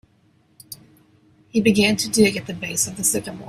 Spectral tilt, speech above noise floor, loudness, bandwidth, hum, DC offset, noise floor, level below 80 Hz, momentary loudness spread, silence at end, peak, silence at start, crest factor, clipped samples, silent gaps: -3.5 dB/octave; 39 dB; -19 LUFS; 16 kHz; none; under 0.1%; -59 dBFS; -56 dBFS; 23 LU; 0 s; -4 dBFS; 0.7 s; 20 dB; under 0.1%; none